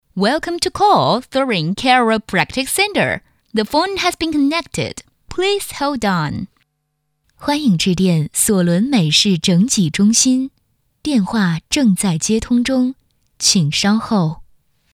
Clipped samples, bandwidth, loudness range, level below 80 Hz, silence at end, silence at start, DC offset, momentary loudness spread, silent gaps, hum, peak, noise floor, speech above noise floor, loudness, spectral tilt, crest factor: under 0.1%; 16 kHz; 5 LU; -46 dBFS; 0.5 s; 0.15 s; under 0.1%; 10 LU; none; none; 0 dBFS; -70 dBFS; 54 dB; -16 LUFS; -4 dB/octave; 16 dB